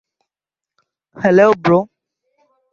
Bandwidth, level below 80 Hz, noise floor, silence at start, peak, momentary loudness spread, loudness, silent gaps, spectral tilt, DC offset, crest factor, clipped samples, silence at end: 7.2 kHz; -58 dBFS; -88 dBFS; 1.2 s; -2 dBFS; 10 LU; -14 LUFS; none; -7.5 dB/octave; under 0.1%; 16 dB; under 0.1%; 0.9 s